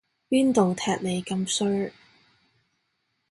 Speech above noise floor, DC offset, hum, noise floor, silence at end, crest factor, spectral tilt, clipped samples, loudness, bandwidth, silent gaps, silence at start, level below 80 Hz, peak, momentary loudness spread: 51 dB; under 0.1%; none; -75 dBFS; 1.4 s; 18 dB; -5 dB/octave; under 0.1%; -25 LUFS; 11.5 kHz; none; 0.3 s; -64 dBFS; -8 dBFS; 7 LU